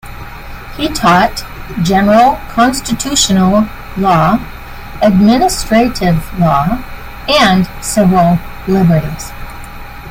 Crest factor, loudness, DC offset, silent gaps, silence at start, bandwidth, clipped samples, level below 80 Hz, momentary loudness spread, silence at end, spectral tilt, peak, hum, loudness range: 12 dB; -11 LUFS; under 0.1%; none; 0.05 s; 16.5 kHz; under 0.1%; -28 dBFS; 20 LU; 0 s; -5 dB/octave; 0 dBFS; none; 1 LU